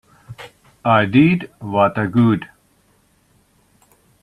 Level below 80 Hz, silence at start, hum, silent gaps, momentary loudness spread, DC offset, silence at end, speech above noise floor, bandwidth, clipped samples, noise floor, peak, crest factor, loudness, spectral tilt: -56 dBFS; 0.3 s; none; none; 24 LU; under 0.1%; 1.75 s; 43 dB; 12 kHz; under 0.1%; -58 dBFS; -2 dBFS; 18 dB; -16 LUFS; -8.5 dB/octave